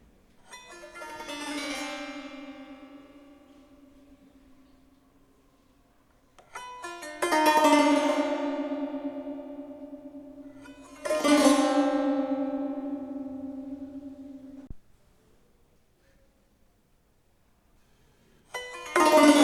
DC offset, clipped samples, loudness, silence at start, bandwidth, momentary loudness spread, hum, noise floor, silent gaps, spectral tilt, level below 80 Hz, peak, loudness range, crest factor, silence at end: under 0.1%; under 0.1%; -26 LUFS; 0.5 s; 14 kHz; 26 LU; none; -65 dBFS; none; -2.5 dB/octave; -62 dBFS; -6 dBFS; 20 LU; 24 dB; 0 s